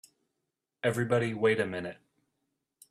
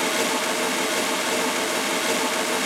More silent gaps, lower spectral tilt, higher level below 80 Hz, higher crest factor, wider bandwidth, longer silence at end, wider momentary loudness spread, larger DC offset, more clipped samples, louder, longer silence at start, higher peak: neither; first, -6 dB/octave vs -1 dB/octave; first, -70 dBFS vs -76 dBFS; first, 20 dB vs 14 dB; second, 14.5 kHz vs 19.5 kHz; first, 1 s vs 0 s; first, 10 LU vs 1 LU; neither; neither; second, -30 LUFS vs -22 LUFS; first, 0.85 s vs 0 s; second, -14 dBFS vs -10 dBFS